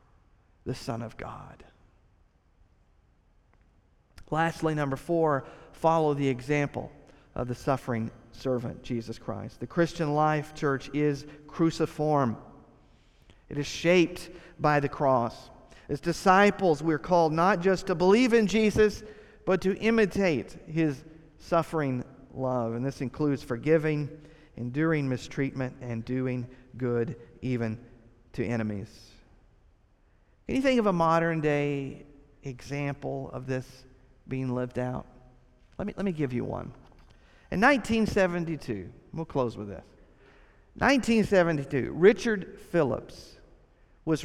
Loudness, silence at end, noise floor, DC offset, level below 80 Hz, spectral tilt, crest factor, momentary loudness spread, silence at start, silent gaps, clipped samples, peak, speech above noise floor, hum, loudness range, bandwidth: -28 LUFS; 0 s; -64 dBFS; under 0.1%; -52 dBFS; -6.5 dB/octave; 22 dB; 17 LU; 0.65 s; none; under 0.1%; -8 dBFS; 36 dB; none; 10 LU; 14.5 kHz